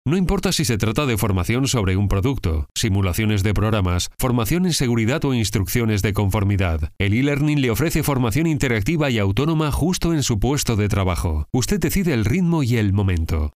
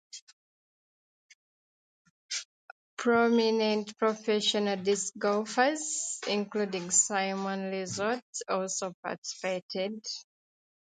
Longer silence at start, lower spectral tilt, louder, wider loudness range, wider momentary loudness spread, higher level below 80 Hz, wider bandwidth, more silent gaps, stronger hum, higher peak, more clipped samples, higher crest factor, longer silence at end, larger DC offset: about the same, 0.05 s vs 0.15 s; first, -5.5 dB/octave vs -2.5 dB/octave; first, -20 LUFS vs -30 LUFS; second, 1 LU vs 6 LU; second, 2 LU vs 12 LU; first, -30 dBFS vs -78 dBFS; first, 16 kHz vs 9.6 kHz; second, 2.71-2.75 s vs 0.22-0.27 s, 0.33-1.29 s, 1.35-2.29 s, 2.45-2.97 s, 8.22-8.33 s, 8.94-9.03 s, 9.18-9.22 s, 9.62-9.69 s; neither; first, -4 dBFS vs -10 dBFS; neither; second, 16 dB vs 22 dB; second, 0.05 s vs 0.7 s; neither